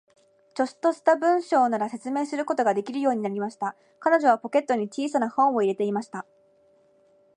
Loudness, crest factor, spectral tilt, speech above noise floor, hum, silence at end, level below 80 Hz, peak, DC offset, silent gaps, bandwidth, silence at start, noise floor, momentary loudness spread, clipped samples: -25 LUFS; 20 dB; -5.5 dB/octave; 37 dB; none; 1.15 s; -82 dBFS; -6 dBFS; under 0.1%; none; 10.5 kHz; 0.55 s; -61 dBFS; 10 LU; under 0.1%